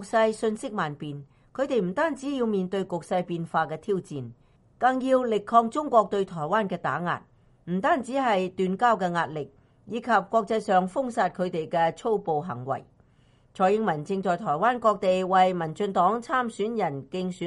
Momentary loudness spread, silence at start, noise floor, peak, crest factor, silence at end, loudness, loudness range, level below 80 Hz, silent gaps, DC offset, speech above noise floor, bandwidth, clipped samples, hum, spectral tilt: 10 LU; 0 s; -60 dBFS; -6 dBFS; 20 dB; 0 s; -26 LUFS; 4 LU; -64 dBFS; none; under 0.1%; 35 dB; 11.5 kHz; under 0.1%; none; -6 dB/octave